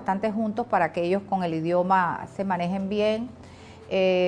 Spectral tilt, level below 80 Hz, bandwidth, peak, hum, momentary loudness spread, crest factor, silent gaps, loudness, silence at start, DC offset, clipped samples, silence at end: -7 dB/octave; -60 dBFS; 10 kHz; -10 dBFS; none; 10 LU; 16 dB; none; -25 LUFS; 0 s; under 0.1%; under 0.1%; 0 s